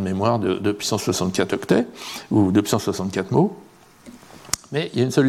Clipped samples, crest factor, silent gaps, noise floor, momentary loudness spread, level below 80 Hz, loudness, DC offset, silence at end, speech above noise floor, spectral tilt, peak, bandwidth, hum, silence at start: under 0.1%; 20 dB; none; -46 dBFS; 7 LU; -56 dBFS; -22 LUFS; under 0.1%; 0 s; 25 dB; -5.5 dB/octave; -2 dBFS; 16.5 kHz; none; 0 s